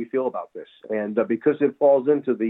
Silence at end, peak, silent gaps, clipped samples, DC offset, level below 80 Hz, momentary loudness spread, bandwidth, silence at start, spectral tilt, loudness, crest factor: 0 s; -8 dBFS; none; under 0.1%; under 0.1%; -78 dBFS; 16 LU; 4 kHz; 0 s; -10.5 dB/octave; -22 LUFS; 14 dB